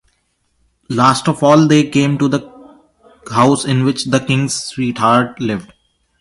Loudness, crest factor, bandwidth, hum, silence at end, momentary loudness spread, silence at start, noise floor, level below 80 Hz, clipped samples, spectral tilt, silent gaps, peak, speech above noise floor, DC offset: -14 LUFS; 16 dB; 11.5 kHz; none; 0.55 s; 10 LU; 0.9 s; -64 dBFS; -52 dBFS; under 0.1%; -5.5 dB/octave; none; 0 dBFS; 50 dB; under 0.1%